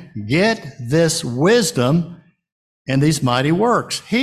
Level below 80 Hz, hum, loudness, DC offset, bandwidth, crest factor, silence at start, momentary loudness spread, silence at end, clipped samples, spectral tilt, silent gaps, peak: -50 dBFS; none; -17 LUFS; under 0.1%; 14 kHz; 14 dB; 0 s; 6 LU; 0 s; under 0.1%; -5 dB/octave; 2.52-2.85 s; -4 dBFS